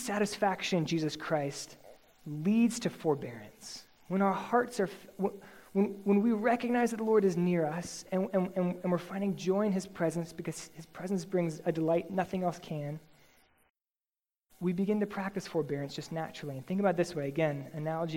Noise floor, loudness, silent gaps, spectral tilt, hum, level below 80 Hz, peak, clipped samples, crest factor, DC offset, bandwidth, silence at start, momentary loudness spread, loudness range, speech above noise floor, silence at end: under -90 dBFS; -32 LUFS; 13.70-13.75 s, 14.09-14.13 s; -6 dB/octave; none; -70 dBFS; -14 dBFS; under 0.1%; 18 dB; under 0.1%; 16.5 kHz; 0 s; 13 LU; 6 LU; over 58 dB; 0 s